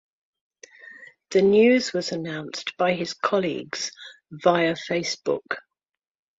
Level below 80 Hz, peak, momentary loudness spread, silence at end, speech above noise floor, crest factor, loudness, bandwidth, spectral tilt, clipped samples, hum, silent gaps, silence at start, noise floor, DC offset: -66 dBFS; -6 dBFS; 17 LU; 0.8 s; 24 dB; 20 dB; -23 LUFS; 7.8 kHz; -4.5 dB/octave; under 0.1%; none; none; 0.85 s; -47 dBFS; under 0.1%